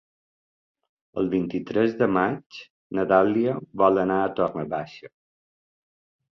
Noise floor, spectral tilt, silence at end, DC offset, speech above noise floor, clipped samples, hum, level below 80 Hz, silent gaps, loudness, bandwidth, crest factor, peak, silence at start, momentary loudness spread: under -90 dBFS; -8.5 dB/octave; 1.25 s; under 0.1%; over 67 dB; under 0.1%; none; -60 dBFS; 2.46-2.50 s, 2.70-2.90 s; -24 LUFS; 6.2 kHz; 20 dB; -4 dBFS; 1.15 s; 15 LU